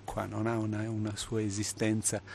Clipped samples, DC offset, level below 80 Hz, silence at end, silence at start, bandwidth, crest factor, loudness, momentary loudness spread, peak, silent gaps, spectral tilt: under 0.1%; under 0.1%; -56 dBFS; 0 s; 0 s; 13 kHz; 16 dB; -33 LUFS; 5 LU; -16 dBFS; none; -4.5 dB/octave